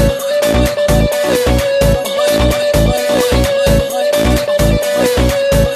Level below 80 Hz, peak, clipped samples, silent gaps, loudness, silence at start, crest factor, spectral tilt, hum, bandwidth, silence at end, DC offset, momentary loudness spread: -20 dBFS; 0 dBFS; under 0.1%; none; -13 LUFS; 0 s; 12 dB; -5 dB/octave; none; 14.5 kHz; 0 s; under 0.1%; 1 LU